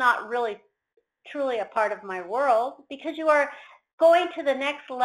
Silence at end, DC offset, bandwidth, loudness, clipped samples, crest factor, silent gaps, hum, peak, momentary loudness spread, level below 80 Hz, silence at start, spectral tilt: 0 s; under 0.1%; 13 kHz; -25 LUFS; under 0.1%; 18 dB; 3.93-3.98 s; none; -8 dBFS; 15 LU; -74 dBFS; 0 s; -3 dB/octave